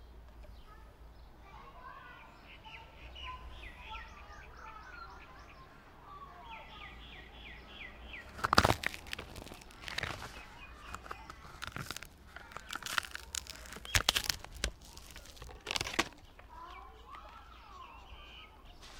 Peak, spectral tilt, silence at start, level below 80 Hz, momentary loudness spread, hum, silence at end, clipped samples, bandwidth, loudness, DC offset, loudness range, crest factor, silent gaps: -6 dBFS; -2.5 dB/octave; 0 s; -54 dBFS; 21 LU; none; 0 s; under 0.1%; 18 kHz; -38 LUFS; under 0.1%; 15 LU; 36 dB; none